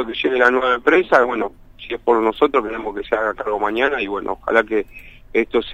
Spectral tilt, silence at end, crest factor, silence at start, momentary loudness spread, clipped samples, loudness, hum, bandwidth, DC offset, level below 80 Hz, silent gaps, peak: -5 dB/octave; 0 s; 18 dB; 0 s; 11 LU; under 0.1%; -18 LUFS; none; 9 kHz; under 0.1%; -46 dBFS; none; 0 dBFS